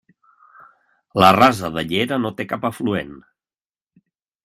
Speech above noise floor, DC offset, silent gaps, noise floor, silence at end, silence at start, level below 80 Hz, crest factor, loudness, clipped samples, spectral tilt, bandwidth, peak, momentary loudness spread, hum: over 72 dB; under 0.1%; none; under -90 dBFS; 1.25 s; 1.15 s; -54 dBFS; 22 dB; -18 LUFS; under 0.1%; -5.5 dB/octave; 16 kHz; 0 dBFS; 14 LU; none